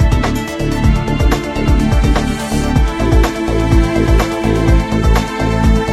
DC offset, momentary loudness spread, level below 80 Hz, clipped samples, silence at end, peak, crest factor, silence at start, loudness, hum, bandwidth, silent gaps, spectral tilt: under 0.1%; 3 LU; -16 dBFS; under 0.1%; 0 s; 0 dBFS; 12 dB; 0 s; -14 LUFS; none; 13.5 kHz; none; -6.5 dB/octave